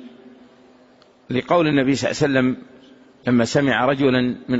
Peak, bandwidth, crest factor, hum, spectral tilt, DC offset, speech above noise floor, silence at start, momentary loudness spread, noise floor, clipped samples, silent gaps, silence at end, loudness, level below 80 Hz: -4 dBFS; 8 kHz; 16 dB; none; -5.5 dB/octave; under 0.1%; 34 dB; 0 s; 9 LU; -52 dBFS; under 0.1%; none; 0 s; -19 LUFS; -54 dBFS